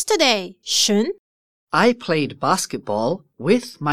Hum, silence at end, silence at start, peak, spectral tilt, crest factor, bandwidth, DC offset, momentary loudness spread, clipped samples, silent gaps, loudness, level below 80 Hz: none; 0 s; 0 s; -2 dBFS; -3 dB/octave; 18 dB; 16 kHz; 0.4%; 8 LU; under 0.1%; 1.19-1.67 s; -20 LUFS; -62 dBFS